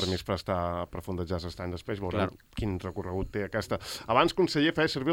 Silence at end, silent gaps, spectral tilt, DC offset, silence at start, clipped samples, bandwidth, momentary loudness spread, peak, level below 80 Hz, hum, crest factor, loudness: 0 s; none; -5.5 dB/octave; under 0.1%; 0 s; under 0.1%; 17 kHz; 10 LU; -8 dBFS; -48 dBFS; none; 22 dB; -30 LUFS